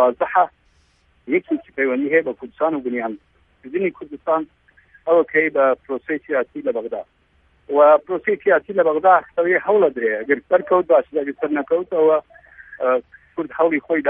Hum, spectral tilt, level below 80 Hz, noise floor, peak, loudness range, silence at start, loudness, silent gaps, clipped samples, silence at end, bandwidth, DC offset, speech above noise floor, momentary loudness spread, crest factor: none; -9 dB/octave; -62 dBFS; -59 dBFS; -2 dBFS; 6 LU; 0 s; -19 LUFS; none; under 0.1%; 0 s; 3.7 kHz; under 0.1%; 41 dB; 11 LU; 18 dB